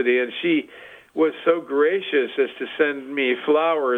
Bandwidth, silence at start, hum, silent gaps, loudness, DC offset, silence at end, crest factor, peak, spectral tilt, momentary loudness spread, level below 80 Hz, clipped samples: 8.6 kHz; 0 s; none; none; -22 LUFS; under 0.1%; 0 s; 16 dB; -6 dBFS; -6 dB/octave; 5 LU; -74 dBFS; under 0.1%